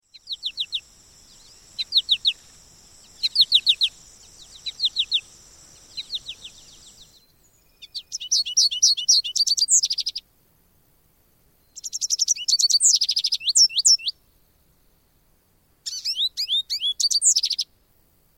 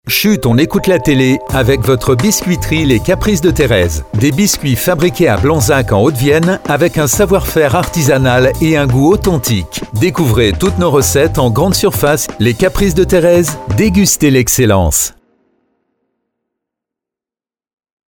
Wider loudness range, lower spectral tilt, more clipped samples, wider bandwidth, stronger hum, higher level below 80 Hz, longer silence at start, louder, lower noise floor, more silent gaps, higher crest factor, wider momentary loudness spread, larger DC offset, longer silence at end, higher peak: first, 10 LU vs 2 LU; second, 4.5 dB/octave vs -5 dB/octave; neither; second, 17 kHz vs over 20 kHz; neither; second, -62 dBFS vs -26 dBFS; first, 0.25 s vs 0.05 s; second, -19 LUFS vs -11 LUFS; second, -62 dBFS vs under -90 dBFS; neither; first, 20 dB vs 12 dB; first, 19 LU vs 4 LU; neither; second, 0.75 s vs 3.05 s; second, -6 dBFS vs 0 dBFS